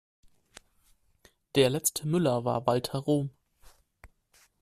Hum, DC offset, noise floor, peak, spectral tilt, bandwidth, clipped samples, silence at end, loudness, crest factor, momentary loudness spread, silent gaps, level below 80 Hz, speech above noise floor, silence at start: none; under 0.1%; -66 dBFS; -10 dBFS; -5 dB/octave; 15.5 kHz; under 0.1%; 0.55 s; -28 LUFS; 20 dB; 5 LU; none; -62 dBFS; 39 dB; 1.55 s